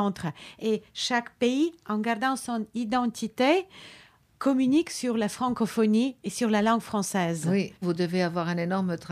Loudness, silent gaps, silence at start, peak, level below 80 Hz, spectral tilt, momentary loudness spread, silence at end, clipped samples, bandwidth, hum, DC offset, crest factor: -27 LUFS; none; 0 s; -10 dBFS; -66 dBFS; -5 dB/octave; 7 LU; 0 s; under 0.1%; 15.5 kHz; none; under 0.1%; 16 dB